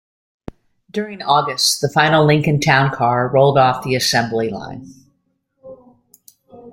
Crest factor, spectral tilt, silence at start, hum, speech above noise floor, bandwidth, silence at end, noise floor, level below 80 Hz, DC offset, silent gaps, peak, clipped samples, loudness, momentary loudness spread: 18 dB; -4.5 dB/octave; 0.95 s; none; 51 dB; 16.5 kHz; 0 s; -67 dBFS; -52 dBFS; under 0.1%; none; 0 dBFS; under 0.1%; -15 LUFS; 13 LU